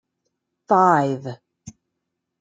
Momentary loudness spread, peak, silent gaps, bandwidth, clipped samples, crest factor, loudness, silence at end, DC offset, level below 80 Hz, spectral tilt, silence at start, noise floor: 21 LU; -4 dBFS; none; 9.2 kHz; under 0.1%; 20 dB; -19 LUFS; 0.7 s; under 0.1%; -68 dBFS; -7 dB/octave; 0.7 s; -79 dBFS